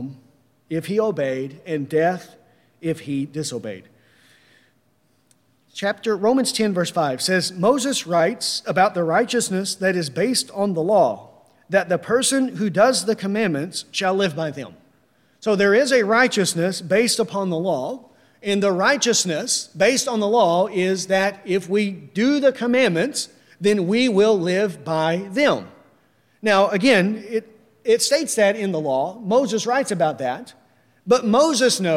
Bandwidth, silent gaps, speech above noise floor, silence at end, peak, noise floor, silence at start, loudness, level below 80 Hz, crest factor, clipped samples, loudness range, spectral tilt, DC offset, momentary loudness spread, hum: 16 kHz; none; 44 dB; 0 s; -2 dBFS; -63 dBFS; 0 s; -20 LUFS; -68 dBFS; 18 dB; under 0.1%; 6 LU; -4 dB/octave; under 0.1%; 11 LU; none